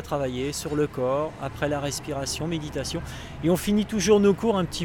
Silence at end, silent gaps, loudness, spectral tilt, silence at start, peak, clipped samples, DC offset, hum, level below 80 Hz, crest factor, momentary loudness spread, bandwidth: 0 s; none; -25 LUFS; -5 dB/octave; 0 s; -8 dBFS; under 0.1%; under 0.1%; none; -44 dBFS; 18 dB; 11 LU; 19 kHz